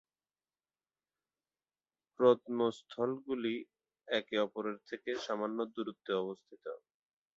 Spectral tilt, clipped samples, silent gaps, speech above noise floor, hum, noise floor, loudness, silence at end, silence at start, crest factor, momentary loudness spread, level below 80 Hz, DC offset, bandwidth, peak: -3.5 dB/octave; under 0.1%; none; over 55 dB; none; under -90 dBFS; -36 LUFS; 0.6 s; 2.2 s; 24 dB; 16 LU; -82 dBFS; under 0.1%; 7.6 kHz; -14 dBFS